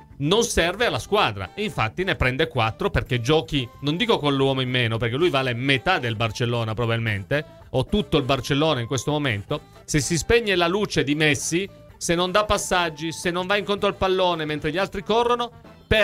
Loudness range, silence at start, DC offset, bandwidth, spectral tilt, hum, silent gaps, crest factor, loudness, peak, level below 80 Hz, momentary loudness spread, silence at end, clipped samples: 2 LU; 0 s; under 0.1%; 16 kHz; -4.5 dB/octave; none; none; 18 dB; -22 LUFS; -4 dBFS; -42 dBFS; 7 LU; 0 s; under 0.1%